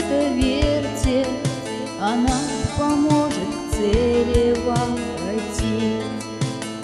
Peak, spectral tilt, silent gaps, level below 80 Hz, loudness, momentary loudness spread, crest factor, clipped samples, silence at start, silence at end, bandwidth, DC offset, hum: -6 dBFS; -5.5 dB/octave; none; -32 dBFS; -21 LUFS; 8 LU; 16 dB; under 0.1%; 0 s; 0 s; 13 kHz; under 0.1%; none